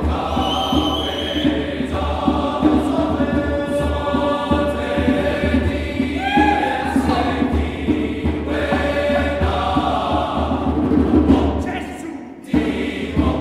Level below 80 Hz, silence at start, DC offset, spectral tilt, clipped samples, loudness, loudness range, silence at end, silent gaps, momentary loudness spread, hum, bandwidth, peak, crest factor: -28 dBFS; 0 s; under 0.1%; -6.5 dB/octave; under 0.1%; -19 LUFS; 1 LU; 0 s; none; 6 LU; none; 13 kHz; -2 dBFS; 16 dB